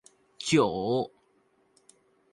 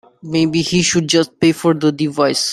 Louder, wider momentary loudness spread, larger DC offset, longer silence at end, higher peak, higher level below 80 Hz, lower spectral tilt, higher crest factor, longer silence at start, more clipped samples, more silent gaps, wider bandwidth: second, -28 LUFS vs -15 LUFS; first, 12 LU vs 4 LU; neither; first, 1.25 s vs 0 s; second, -10 dBFS vs -2 dBFS; second, -64 dBFS vs -50 dBFS; about the same, -5 dB/octave vs -4.5 dB/octave; first, 22 dB vs 14 dB; first, 0.4 s vs 0.25 s; neither; neither; second, 11.5 kHz vs 13.5 kHz